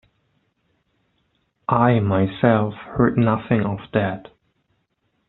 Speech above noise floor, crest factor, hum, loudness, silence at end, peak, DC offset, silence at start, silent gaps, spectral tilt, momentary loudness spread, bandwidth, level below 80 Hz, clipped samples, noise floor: 51 dB; 18 dB; none; -20 LUFS; 1.1 s; -4 dBFS; under 0.1%; 1.7 s; none; -7 dB/octave; 9 LU; 4.1 kHz; -50 dBFS; under 0.1%; -70 dBFS